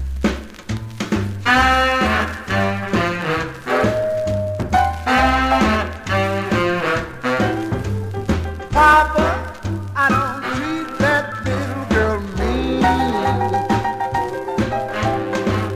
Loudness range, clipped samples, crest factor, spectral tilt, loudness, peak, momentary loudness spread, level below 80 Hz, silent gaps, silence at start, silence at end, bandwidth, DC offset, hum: 2 LU; under 0.1%; 18 dB; -5.5 dB/octave; -19 LUFS; -2 dBFS; 9 LU; -32 dBFS; none; 0 s; 0 s; 15.5 kHz; 0.2%; none